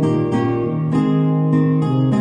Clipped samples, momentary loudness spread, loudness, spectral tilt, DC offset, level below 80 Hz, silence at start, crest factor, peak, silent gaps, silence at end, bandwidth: under 0.1%; 3 LU; -17 LUFS; -9.5 dB/octave; under 0.1%; -50 dBFS; 0 s; 10 dB; -6 dBFS; none; 0 s; 8.8 kHz